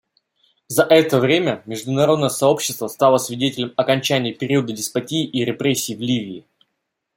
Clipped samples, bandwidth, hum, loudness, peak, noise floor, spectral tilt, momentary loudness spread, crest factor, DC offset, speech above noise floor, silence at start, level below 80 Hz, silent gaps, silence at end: under 0.1%; 16.5 kHz; none; -19 LUFS; -2 dBFS; -76 dBFS; -4.5 dB/octave; 9 LU; 18 dB; under 0.1%; 57 dB; 0.7 s; -62 dBFS; none; 0.75 s